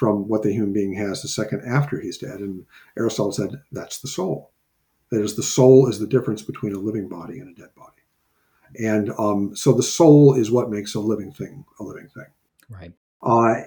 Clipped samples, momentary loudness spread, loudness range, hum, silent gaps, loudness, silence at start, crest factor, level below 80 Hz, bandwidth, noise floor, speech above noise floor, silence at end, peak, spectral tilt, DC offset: under 0.1%; 22 LU; 9 LU; none; 12.97-13.20 s; -20 LUFS; 0 s; 18 dB; -60 dBFS; 19.5 kHz; -69 dBFS; 49 dB; 0 s; -2 dBFS; -6 dB/octave; under 0.1%